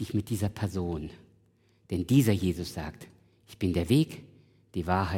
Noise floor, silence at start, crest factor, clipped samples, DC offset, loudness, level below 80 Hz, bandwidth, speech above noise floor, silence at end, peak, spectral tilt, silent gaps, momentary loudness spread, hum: -65 dBFS; 0 s; 20 dB; under 0.1%; under 0.1%; -29 LUFS; -54 dBFS; 17.5 kHz; 37 dB; 0 s; -10 dBFS; -6.5 dB/octave; none; 16 LU; none